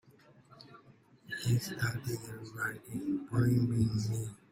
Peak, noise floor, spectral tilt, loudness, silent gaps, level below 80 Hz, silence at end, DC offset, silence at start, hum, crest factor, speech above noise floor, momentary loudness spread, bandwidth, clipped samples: -18 dBFS; -61 dBFS; -6 dB/octave; -34 LUFS; none; -60 dBFS; 0.15 s; under 0.1%; 0.55 s; none; 18 dB; 28 dB; 15 LU; 16 kHz; under 0.1%